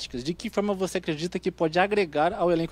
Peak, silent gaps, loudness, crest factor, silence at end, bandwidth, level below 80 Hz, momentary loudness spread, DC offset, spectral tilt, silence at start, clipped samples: -6 dBFS; none; -26 LUFS; 20 dB; 0 s; 15 kHz; -52 dBFS; 7 LU; under 0.1%; -5.5 dB/octave; 0 s; under 0.1%